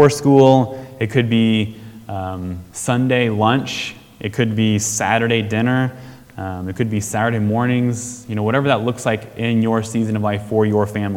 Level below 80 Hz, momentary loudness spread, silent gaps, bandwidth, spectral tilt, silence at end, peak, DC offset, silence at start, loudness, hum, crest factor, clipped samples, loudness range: -52 dBFS; 12 LU; none; 17 kHz; -5.5 dB/octave; 0 s; 0 dBFS; under 0.1%; 0 s; -18 LUFS; none; 18 dB; under 0.1%; 2 LU